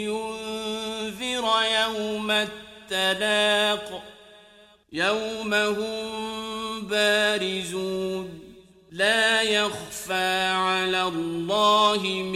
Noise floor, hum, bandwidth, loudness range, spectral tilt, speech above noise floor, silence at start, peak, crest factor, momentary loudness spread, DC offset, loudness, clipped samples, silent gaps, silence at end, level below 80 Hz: -54 dBFS; none; 16 kHz; 4 LU; -2.5 dB/octave; 30 dB; 0 s; -8 dBFS; 16 dB; 11 LU; under 0.1%; -24 LUFS; under 0.1%; none; 0 s; -60 dBFS